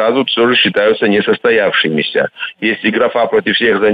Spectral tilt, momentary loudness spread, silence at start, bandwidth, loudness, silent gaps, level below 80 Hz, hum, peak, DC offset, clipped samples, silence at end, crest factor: -7 dB/octave; 6 LU; 0 s; 5 kHz; -12 LUFS; none; -54 dBFS; none; -2 dBFS; under 0.1%; under 0.1%; 0 s; 10 dB